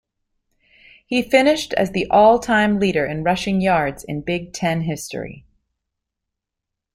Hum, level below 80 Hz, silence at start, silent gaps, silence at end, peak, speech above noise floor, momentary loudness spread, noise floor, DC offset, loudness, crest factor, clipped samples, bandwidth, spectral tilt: none; -48 dBFS; 1.1 s; none; 1.55 s; -2 dBFS; 65 dB; 13 LU; -83 dBFS; under 0.1%; -18 LUFS; 18 dB; under 0.1%; 16 kHz; -5.5 dB/octave